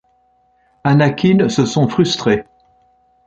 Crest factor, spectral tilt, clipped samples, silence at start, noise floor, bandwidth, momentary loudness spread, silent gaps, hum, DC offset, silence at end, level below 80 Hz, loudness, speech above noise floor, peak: 14 dB; -6 dB/octave; under 0.1%; 0.85 s; -57 dBFS; 8.8 kHz; 5 LU; none; none; under 0.1%; 0.85 s; -50 dBFS; -15 LUFS; 44 dB; -2 dBFS